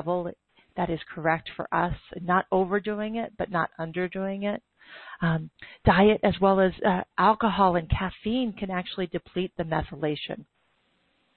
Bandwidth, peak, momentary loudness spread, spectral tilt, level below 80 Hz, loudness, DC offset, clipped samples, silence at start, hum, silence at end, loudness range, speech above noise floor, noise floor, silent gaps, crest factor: 4.5 kHz; -8 dBFS; 10 LU; -10.5 dB/octave; -46 dBFS; -26 LUFS; under 0.1%; under 0.1%; 0 s; none; 0.95 s; 7 LU; 43 dB; -69 dBFS; none; 20 dB